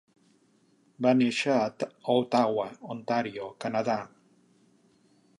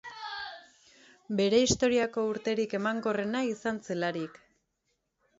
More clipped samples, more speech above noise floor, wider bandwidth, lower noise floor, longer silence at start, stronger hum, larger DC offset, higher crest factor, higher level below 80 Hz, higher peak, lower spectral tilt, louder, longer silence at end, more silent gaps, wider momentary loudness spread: neither; second, 38 dB vs 50 dB; first, 11 kHz vs 8 kHz; second, -65 dBFS vs -79 dBFS; first, 1 s vs 0.05 s; neither; neither; about the same, 18 dB vs 20 dB; second, -78 dBFS vs -60 dBFS; about the same, -10 dBFS vs -12 dBFS; first, -5.5 dB/octave vs -4 dB/octave; about the same, -28 LUFS vs -30 LUFS; first, 1.35 s vs 1.1 s; neither; second, 12 LU vs 15 LU